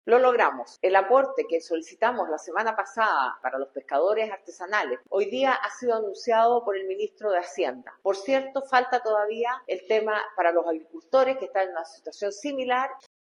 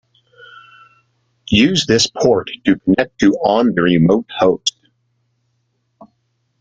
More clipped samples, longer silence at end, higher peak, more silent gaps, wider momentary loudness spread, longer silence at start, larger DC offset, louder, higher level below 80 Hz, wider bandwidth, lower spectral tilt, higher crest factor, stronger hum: neither; second, 0.4 s vs 1.9 s; second, -6 dBFS vs 0 dBFS; neither; first, 10 LU vs 4 LU; second, 0.05 s vs 1.5 s; neither; second, -26 LUFS vs -15 LUFS; second, -84 dBFS vs -46 dBFS; first, 10.5 kHz vs 9.4 kHz; second, -3 dB/octave vs -5 dB/octave; about the same, 20 dB vs 16 dB; neither